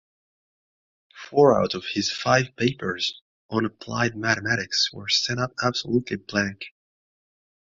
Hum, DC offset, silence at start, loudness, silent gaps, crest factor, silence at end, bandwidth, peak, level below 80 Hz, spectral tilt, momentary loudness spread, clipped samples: none; under 0.1%; 1.15 s; -24 LUFS; 3.21-3.49 s; 22 dB; 1.1 s; 7.8 kHz; -4 dBFS; -58 dBFS; -4 dB/octave; 9 LU; under 0.1%